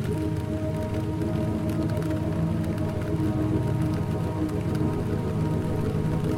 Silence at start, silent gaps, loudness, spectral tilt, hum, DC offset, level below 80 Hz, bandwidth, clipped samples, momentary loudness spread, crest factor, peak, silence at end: 0 s; none; -27 LUFS; -8.5 dB/octave; none; under 0.1%; -40 dBFS; 15.5 kHz; under 0.1%; 3 LU; 12 dB; -14 dBFS; 0 s